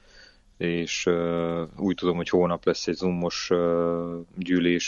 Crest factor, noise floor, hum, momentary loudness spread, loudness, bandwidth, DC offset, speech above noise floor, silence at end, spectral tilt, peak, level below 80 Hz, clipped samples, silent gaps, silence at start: 18 dB; -53 dBFS; none; 6 LU; -26 LUFS; 7.4 kHz; under 0.1%; 28 dB; 0 s; -5 dB/octave; -8 dBFS; -56 dBFS; under 0.1%; none; 0.15 s